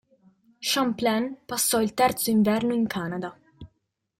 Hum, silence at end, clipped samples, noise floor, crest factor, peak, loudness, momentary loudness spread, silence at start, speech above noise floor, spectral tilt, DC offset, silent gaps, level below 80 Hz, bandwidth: none; 0.55 s; under 0.1%; -76 dBFS; 16 dB; -10 dBFS; -24 LUFS; 10 LU; 0.6 s; 52 dB; -3.5 dB/octave; under 0.1%; none; -60 dBFS; 16.5 kHz